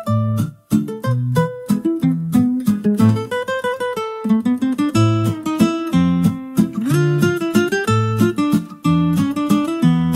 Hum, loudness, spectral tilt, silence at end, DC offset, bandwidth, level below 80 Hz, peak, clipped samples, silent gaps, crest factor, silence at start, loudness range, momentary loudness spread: none; -18 LUFS; -7 dB/octave; 0 s; under 0.1%; 16 kHz; -48 dBFS; -2 dBFS; under 0.1%; none; 14 dB; 0 s; 1 LU; 5 LU